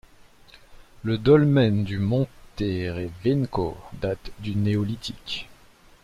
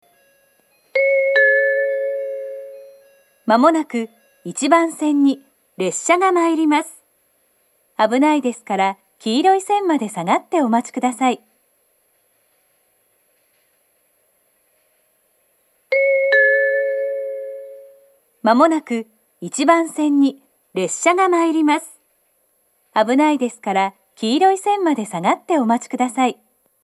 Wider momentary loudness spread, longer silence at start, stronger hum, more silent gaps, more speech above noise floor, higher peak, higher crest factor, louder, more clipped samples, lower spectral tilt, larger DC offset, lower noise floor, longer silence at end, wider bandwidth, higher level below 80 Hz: about the same, 15 LU vs 14 LU; second, 0.7 s vs 0.95 s; neither; neither; second, 30 dB vs 46 dB; second, -6 dBFS vs 0 dBFS; about the same, 20 dB vs 18 dB; second, -25 LUFS vs -18 LUFS; neither; first, -8 dB/octave vs -4 dB/octave; neither; second, -53 dBFS vs -63 dBFS; about the same, 0.6 s vs 0.5 s; about the same, 13 kHz vs 13 kHz; first, -48 dBFS vs -80 dBFS